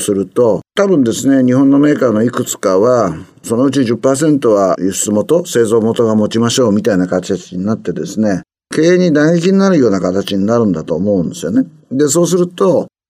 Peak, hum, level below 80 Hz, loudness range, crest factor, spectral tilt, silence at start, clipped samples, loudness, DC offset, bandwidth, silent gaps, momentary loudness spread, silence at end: 0 dBFS; none; -56 dBFS; 2 LU; 12 dB; -5.5 dB/octave; 0 s; under 0.1%; -13 LUFS; under 0.1%; 16 kHz; none; 8 LU; 0.2 s